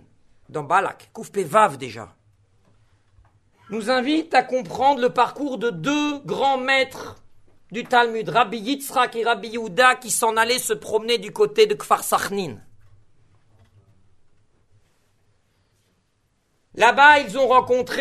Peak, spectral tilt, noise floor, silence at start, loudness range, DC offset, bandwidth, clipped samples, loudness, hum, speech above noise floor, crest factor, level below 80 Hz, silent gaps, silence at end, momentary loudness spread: -2 dBFS; -3 dB/octave; -67 dBFS; 0.5 s; 6 LU; under 0.1%; 13.5 kHz; under 0.1%; -20 LUFS; none; 47 dB; 20 dB; -62 dBFS; none; 0 s; 16 LU